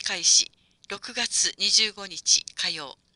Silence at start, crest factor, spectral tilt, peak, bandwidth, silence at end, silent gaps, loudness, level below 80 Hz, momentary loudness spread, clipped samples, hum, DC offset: 0 s; 22 dB; 2 dB/octave; -4 dBFS; 11.5 kHz; 0.25 s; none; -22 LUFS; -66 dBFS; 15 LU; under 0.1%; none; under 0.1%